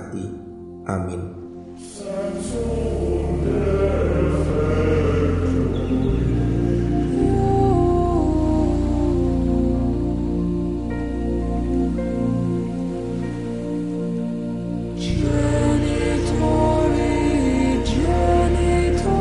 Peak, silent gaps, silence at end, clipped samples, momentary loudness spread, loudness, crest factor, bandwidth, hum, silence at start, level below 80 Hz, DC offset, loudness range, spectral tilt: -4 dBFS; none; 0 s; under 0.1%; 9 LU; -21 LUFS; 16 dB; 11.5 kHz; none; 0 s; -28 dBFS; 0.5%; 5 LU; -7.5 dB/octave